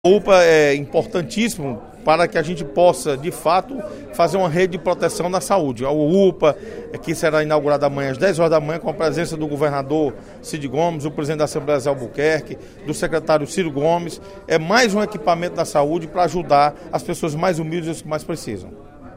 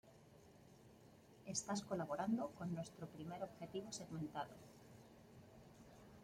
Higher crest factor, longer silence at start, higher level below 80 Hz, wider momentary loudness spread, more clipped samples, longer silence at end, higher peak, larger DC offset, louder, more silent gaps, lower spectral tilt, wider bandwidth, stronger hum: about the same, 18 dB vs 20 dB; about the same, 0.05 s vs 0.05 s; first, -46 dBFS vs -76 dBFS; second, 12 LU vs 22 LU; neither; about the same, 0 s vs 0 s; first, 0 dBFS vs -30 dBFS; neither; first, -19 LUFS vs -47 LUFS; neither; about the same, -5 dB/octave vs -5 dB/octave; about the same, 16 kHz vs 16.5 kHz; neither